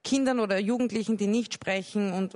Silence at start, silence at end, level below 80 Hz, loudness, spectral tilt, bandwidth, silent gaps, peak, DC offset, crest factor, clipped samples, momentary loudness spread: 0.05 s; 0.05 s; -68 dBFS; -28 LUFS; -5 dB/octave; 11 kHz; none; -14 dBFS; under 0.1%; 14 dB; under 0.1%; 4 LU